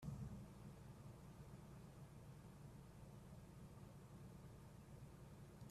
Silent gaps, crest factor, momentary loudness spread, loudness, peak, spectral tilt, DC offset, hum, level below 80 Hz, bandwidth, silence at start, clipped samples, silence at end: none; 18 dB; 4 LU; -60 LUFS; -40 dBFS; -7 dB/octave; under 0.1%; none; -68 dBFS; 14.5 kHz; 0 s; under 0.1%; 0 s